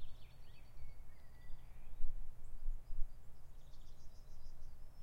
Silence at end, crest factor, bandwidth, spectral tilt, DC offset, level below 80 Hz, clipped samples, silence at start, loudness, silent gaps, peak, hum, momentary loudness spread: 0 s; 16 dB; 3.5 kHz; -5.5 dB/octave; under 0.1%; -46 dBFS; under 0.1%; 0 s; -57 LUFS; none; -22 dBFS; none; 10 LU